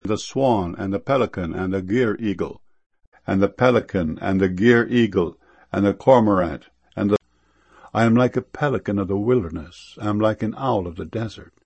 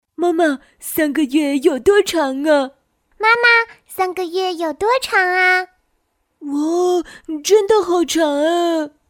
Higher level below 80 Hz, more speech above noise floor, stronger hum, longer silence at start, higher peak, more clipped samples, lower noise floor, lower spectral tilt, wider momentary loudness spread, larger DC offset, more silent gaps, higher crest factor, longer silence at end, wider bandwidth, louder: first, -48 dBFS vs -54 dBFS; second, 41 dB vs 51 dB; neither; second, 0.05 s vs 0.2 s; about the same, 0 dBFS vs -2 dBFS; neither; second, -61 dBFS vs -67 dBFS; first, -7.5 dB/octave vs -2 dB/octave; about the same, 13 LU vs 11 LU; neither; first, 2.86-2.90 s, 3.07-3.12 s vs none; first, 20 dB vs 14 dB; about the same, 0.2 s vs 0.2 s; second, 8.6 kHz vs 18 kHz; second, -21 LUFS vs -16 LUFS